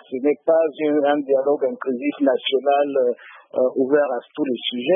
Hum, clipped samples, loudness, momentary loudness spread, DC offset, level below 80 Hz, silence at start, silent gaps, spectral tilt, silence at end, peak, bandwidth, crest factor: none; under 0.1%; -20 LUFS; 6 LU; under 0.1%; -82 dBFS; 0.1 s; none; -9.5 dB/octave; 0 s; -6 dBFS; 3.8 kHz; 14 dB